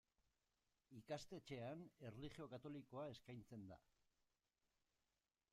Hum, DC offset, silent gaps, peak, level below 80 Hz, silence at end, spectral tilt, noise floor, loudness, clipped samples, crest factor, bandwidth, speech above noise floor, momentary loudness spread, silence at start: none; under 0.1%; none; -38 dBFS; -80 dBFS; 1.7 s; -6 dB/octave; under -90 dBFS; -57 LUFS; under 0.1%; 20 dB; 13.5 kHz; over 34 dB; 9 LU; 0.9 s